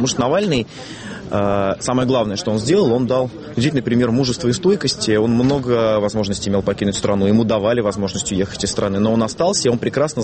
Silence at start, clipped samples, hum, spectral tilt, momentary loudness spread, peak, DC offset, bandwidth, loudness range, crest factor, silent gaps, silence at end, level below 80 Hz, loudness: 0 s; under 0.1%; none; -5 dB/octave; 5 LU; -4 dBFS; under 0.1%; 8.8 kHz; 1 LU; 14 dB; none; 0 s; -44 dBFS; -18 LUFS